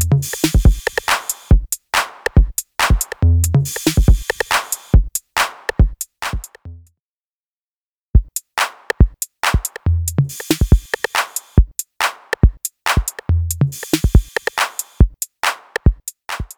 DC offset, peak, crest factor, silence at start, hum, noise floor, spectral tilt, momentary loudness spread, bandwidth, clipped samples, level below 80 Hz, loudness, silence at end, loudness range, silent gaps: under 0.1%; 0 dBFS; 16 dB; 0 s; none; under -90 dBFS; -4.5 dB/octave; 6 LU; over 20 kHz; under 0.1%; -20 dBFS; -18 LUFS; 0.1 s; 5 LU; 7.00-8.14 s